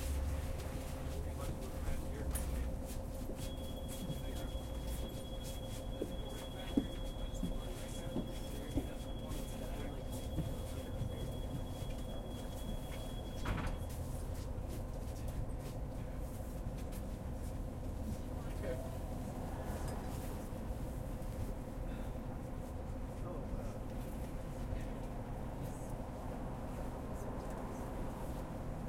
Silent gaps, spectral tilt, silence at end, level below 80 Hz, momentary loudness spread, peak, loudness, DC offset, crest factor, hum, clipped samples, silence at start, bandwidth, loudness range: none; -6 dB/octave; 0 s; -44 dBFS; 4 LU; -18 dBFS; -44 LUFS; under 0.1%; 24 dB; none; under 0.1%; 0 s; 16.5 kHz; 2 LU